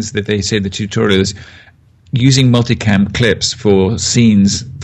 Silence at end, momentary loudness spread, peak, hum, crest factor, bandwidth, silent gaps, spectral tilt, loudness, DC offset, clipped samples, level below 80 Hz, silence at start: 0 s; 7 LU; 0 dBFS; none; 12 dB; 9.6 kHz; none; -5 dB/octave; -13 LUFS; under 0.1%; under 0.1%; -40 dBFS; 0 s